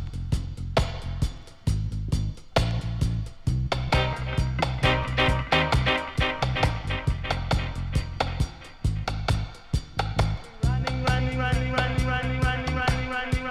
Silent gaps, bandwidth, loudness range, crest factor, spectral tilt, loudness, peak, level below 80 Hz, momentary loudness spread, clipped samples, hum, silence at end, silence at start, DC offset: none; 13.5 kHz; 4 LU; 20 dB; -5.5 dB/octave; -27 LUFS; -6 dBFS; -32 dBFS; 7 LU; under 0.1%; none; 0 s; 0 s; under 0.1%